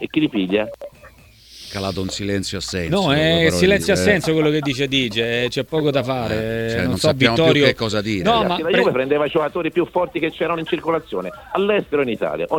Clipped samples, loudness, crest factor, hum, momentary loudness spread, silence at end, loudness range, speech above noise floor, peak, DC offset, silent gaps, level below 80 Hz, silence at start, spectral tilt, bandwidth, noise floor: under 0.1%; -19 LUFS; 18 dB; none; 9 LU; 0 s; 4 LU; 27 dB; 0 dBFS; under 0.1%; none; -44 dBFS; 0 s; -5 dB/octave; 18.5 kHz; -46 dBFS